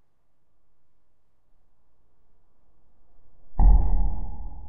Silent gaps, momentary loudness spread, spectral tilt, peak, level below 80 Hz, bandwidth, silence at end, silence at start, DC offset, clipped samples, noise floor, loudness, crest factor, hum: none; 16 LU; -13 dB/octave; -6 dBFS; -26 dBFS; 2 kHz; 0.15 s; 0 s; under 0.1%; under 0.1%; -67 dBFS; -25 LUFS; 20 dB; none